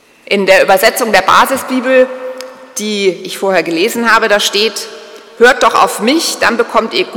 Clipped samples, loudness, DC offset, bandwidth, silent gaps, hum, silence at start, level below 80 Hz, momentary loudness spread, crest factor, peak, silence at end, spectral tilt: 2%; -10 LUFS; under 0.1%; over 20 kHz; none; none; 0.3 s; -48 dBFS; 12 LU; 12 dB; 0 dBFS; 0 s; -2.5 dB/octave